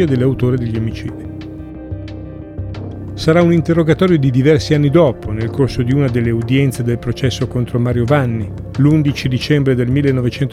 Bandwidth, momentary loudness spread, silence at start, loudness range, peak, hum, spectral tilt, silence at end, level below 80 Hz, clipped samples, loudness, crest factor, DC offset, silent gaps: 13 kHz; 16 LU; 0 s; 5 LU; 0 dBFS; none; -7.5 dB/octave; 0 s; -36 dBFS; under 0.1%; -15 LUFS; 14 dB; under 0.1%; none